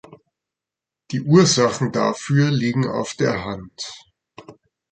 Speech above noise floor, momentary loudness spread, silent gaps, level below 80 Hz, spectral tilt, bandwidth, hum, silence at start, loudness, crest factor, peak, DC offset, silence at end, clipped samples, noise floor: 68 dB; 17 LU; none; -54 dBFS; -5 dB/octave; 9.2 kHz; none; 0.1 s; -19 LUFS; 20 dB; -2 dBFS; under 0.1%; 0.4 s; under 0.1%; -87 dBFS